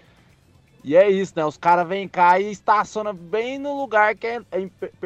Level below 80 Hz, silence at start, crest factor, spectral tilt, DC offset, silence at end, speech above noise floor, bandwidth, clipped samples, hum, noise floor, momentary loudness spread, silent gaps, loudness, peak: -62 dBFS; 0.85 s; 16 dB; -5.5 dB/octave; under 0.1%; 0 s; 35 dB; 8.4 kHz; under 0.1%; none; -55 dBFS; 12 LU; none; -20 LUFS; -4 dBFS